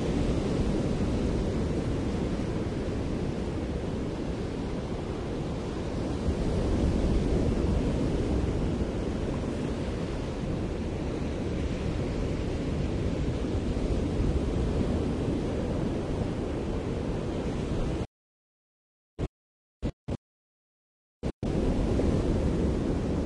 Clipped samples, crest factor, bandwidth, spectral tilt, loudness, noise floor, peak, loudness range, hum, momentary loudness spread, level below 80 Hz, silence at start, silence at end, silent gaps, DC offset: under 0.1%; 16 dB; 11 kHz; -7.5 dB/octave; -31 LUFS; under -90 dBFS; -14 dBFS; 6 LU; none; 6 LU; -36 dBFS; 0 s; 0 s; 18.07-19.17 s, 19.28-19.81 s, 19.93-20.07 s, 20.17-21.22 s, 21.33-21.41 s; under 0.1%